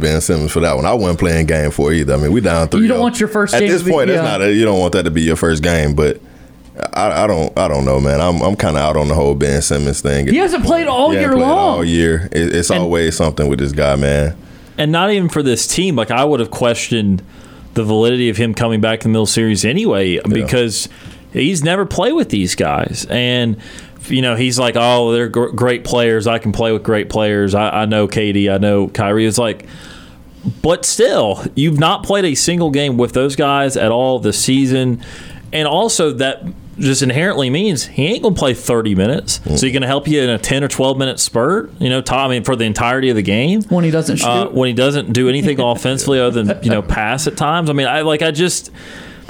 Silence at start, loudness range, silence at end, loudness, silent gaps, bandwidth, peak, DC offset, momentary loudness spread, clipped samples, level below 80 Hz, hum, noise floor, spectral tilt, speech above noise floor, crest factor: 0 s; 2 LU; 0.05 s; -14 LUFS; none; 19.5 kHz; -2 dBFS; under 0.1%; 5 LU; under 0.1%; -32 dBFS; none; -38 dBFS; -5 dB/octave; 24 dB; 12 dB